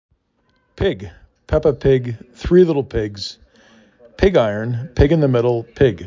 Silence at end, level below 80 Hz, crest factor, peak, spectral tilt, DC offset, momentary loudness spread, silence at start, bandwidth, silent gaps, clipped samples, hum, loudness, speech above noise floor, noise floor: 0 s; -32 dBFS; 16 dB; -2 dBFS; -8 dB/octave; under 0.1%; 15 LU; 0.8 s; 7.6 kHz; none; under 0.1%; none; -17 LUFS; 47 dB; -64 dBFS